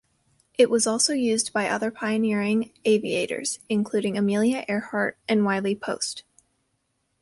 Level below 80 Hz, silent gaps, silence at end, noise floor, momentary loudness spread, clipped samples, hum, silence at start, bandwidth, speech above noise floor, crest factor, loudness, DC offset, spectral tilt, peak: -68 dBFS; none; 1 s; -73 dBFS; 7 LU; under 0.1%; none; 0.6 s; 11.5 kHz; 50 dB; 18 dB; -24 LUFS; under 0.1%; -4 dB/octave; -6 dBFS